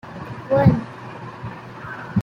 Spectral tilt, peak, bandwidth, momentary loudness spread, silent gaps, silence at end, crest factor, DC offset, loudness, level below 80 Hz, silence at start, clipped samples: -9.5 dB/octave; -2 dBFS; 7 kHz; 19 LU; none; 0 s; 20 dB; under 0.1%; -19 LUFS; -48 dBFS; 0.05 s; under 0.1%